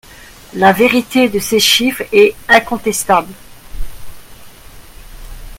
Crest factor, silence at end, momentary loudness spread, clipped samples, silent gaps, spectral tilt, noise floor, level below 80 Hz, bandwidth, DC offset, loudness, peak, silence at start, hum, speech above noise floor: 14 dB; 0 s; 23 LU; under 0.1%; none; -3 dB/octave; -38 dBFS; -34 dBFS; 17 kHz; under 0.1%; -12 LUFS; 0 dBFS; 0.2 s; none; 26 dB